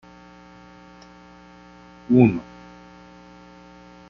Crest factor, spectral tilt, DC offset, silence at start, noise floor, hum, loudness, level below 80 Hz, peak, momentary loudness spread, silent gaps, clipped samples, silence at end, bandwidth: 24 dB; -9 dB/octave; under 0.1%; 2.1 s; -47 dBFS; 60 Hz at -40 dBFS; -19 LUFS; -56 dBFS; -2 dBFS; 30 LU; none; under 0.1%; 1.7 s; 6.6 kHz